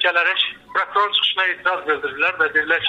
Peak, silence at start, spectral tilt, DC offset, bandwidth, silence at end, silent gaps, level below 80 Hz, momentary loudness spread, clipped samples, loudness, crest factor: -6 dBFS; 0 s; -2.5 dB/octave; under 0.1%; 9.8 kHz; 0 s; none; -62 dBFS; 5 LU; under 0.1%; -18 LUFS; 14 dB